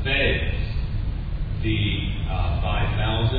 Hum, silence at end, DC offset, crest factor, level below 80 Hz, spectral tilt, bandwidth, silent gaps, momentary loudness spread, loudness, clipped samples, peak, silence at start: none; 0 s; under 0.1%; 14 dB; -26 dBFS; -9 dB/octave; 4.9 kHz; none; 8 LU; -25 LUFS; under 0.1%; -10 dBFS; 0 s